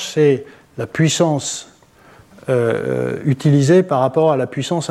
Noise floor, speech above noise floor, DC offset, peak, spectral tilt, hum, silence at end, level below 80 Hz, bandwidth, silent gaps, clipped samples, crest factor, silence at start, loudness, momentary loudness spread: -47 dBFS; 31 dB; under 0.1%; -4 dBFS; -5.5 dB/octave; none; 0 s; -58 dBFS; 13 kHz; none; under 0.1%; 14 dB; 0 s; -17 LUFS; 12 LU